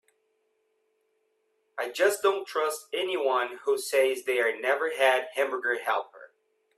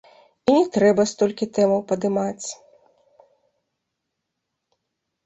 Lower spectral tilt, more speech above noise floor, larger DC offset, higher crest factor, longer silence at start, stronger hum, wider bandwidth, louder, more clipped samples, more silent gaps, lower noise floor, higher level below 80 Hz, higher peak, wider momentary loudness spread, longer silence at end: second, -0.5 dB/octave vs -5.5 dB/octave; second, 47 dB vs 60 dB; neither; about the same, 20 dB vs 20 dB; first, 1.75 s vs 0.45 s; neither; first, 15.5 kHz vs 8.2 kHz; second, -27 LUFS vs -21 LUFS; neither; neither; second, -74 dBFS vs -80 dBFS; second, -82 dBFS vs -64 dBFS; second, -8 dBFS vs -4 dBFS; second, 7 LU vs 13 LU; second, 0.5 s vs 2.7 s